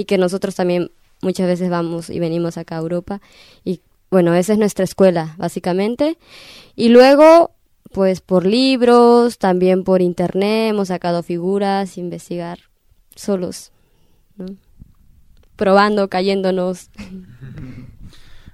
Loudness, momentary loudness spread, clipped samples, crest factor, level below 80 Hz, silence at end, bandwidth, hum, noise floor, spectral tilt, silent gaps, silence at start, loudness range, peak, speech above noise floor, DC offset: -16 LUFS; 22 LU; under 0.1%; 16 dB; -50 dBFS; 0.05 s; 15 kHz; none; -54 dBFS; -6.5 dB/octave; none; 0 s; 11 LU; 0 dBFS; 38 dB; under 0.1%